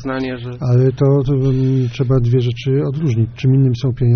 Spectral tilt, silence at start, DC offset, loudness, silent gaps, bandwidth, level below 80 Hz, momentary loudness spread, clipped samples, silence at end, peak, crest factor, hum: -8.5 dB/octave; 0 s; under 0.1%; -16 LUFS; none; 6.4 kHz; -36 dBFS; 5 LU; under 0.1%; 0 s; -4 dBFS; 12 dB; none